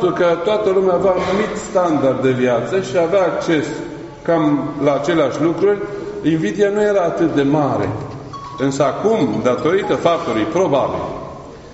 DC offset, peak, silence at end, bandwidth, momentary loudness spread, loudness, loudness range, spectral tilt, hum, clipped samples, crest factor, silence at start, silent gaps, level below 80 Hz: under 0.1%; -2 dBFS; 0 s; 8 kHz; 10 LU; -17 LUFS; 1 LU; -5.5 dB/octave; none; under 0.1%; 16 dB; 0 s; none; -48 dBFS